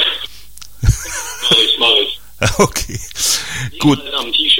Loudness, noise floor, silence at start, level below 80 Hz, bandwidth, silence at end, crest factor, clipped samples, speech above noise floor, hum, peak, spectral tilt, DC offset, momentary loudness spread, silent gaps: -14 LUFS; -39 dBFS; 0 s; -28 dBFS; 17 kHz; 0 s; 16 dB; under 0.1%; 23 dB; none; 0 dBFS; -3 dB/octave; 2%; 13 LU; none